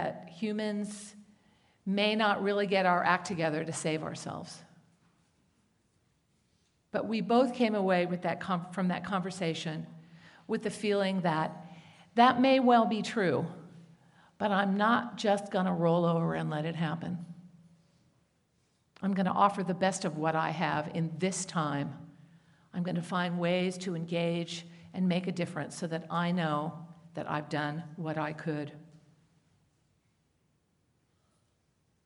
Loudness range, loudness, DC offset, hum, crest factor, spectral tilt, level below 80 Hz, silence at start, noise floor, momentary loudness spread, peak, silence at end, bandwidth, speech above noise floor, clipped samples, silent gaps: 10 LU; -31 LUFS; under 0.1%; none; 24 dB; -5.5 dB/octave; -76 dBFS; 0 s; -74 dBFS; 14 LU; -8 dBFS; 3.2 s; 11.5 kHz; 44 dB; under 0.1%; none